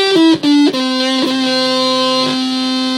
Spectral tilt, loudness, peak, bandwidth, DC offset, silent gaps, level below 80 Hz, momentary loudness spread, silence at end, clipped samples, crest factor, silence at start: -3 dB/octave; -13 LUFS; -2 dBFS; 13.5 kHz; under 0.1%; none; -66 dBFS; 5 LU; 0 s; under 0.1%; 12 dB; 0 s